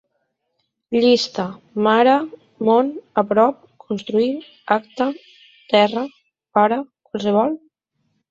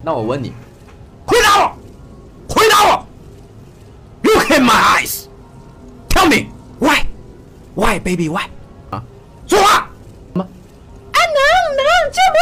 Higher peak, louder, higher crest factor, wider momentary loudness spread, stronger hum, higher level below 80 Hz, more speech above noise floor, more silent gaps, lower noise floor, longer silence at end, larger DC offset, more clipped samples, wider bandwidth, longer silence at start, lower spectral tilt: about the same, -2 dBFS vs -4 dBFS; second, -19 LUFS vs -13 LUFS; first, 18 dB vs 12 dB; second, 14 LU vs 19 LU; neither; second, -66 dBFS vs -32 dBFS; first, 55 dB vs 25 dB; neither; first, -73 dBFS vs -39 dBFS; first, 0.75 s vs 0 s; neither; neither; second, 7.8 kHz vs 16 kHz; first, 0.9 s vs 0 s; first, -5.5 dB/octave vs -3.5 dB/octave